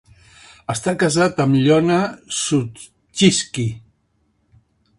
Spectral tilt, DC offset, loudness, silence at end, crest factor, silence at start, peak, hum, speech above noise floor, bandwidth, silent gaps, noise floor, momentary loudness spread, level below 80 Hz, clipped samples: -4.5 dB/octave; under 0.1%; -18 LUFS; 1.2 s; 20 dB; 0.7 s; 0 dBFS; none; 47 dB; 11.5 kHz; none; -65 dBFS; 15 LU; -52 dBFS; under 0.1%